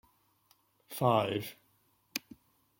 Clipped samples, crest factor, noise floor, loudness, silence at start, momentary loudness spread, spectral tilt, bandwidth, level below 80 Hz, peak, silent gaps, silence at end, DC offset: under 0.1%; 24 dB; -72 dBFS; -33 LUFS; 0.9 s; 16 LU; -5.5 dB/octave; 17 kHz; -74 dBFS; -12 dBFS; none; 0.6 s; under 0.1%